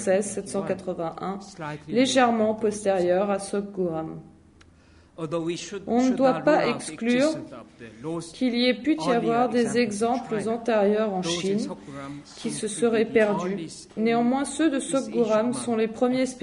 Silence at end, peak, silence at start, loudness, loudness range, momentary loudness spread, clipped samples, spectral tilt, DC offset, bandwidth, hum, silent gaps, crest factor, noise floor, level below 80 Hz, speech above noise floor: 0 s; -6 dBFS; 0 s; -25 LUFS; 2 LU; 13 LU; under 0.1%; -4.5 dB/octave; under 0.1%; 11 kHz; none; none; 18 dB; -54 dBFS; -60 dBFS; 30 dB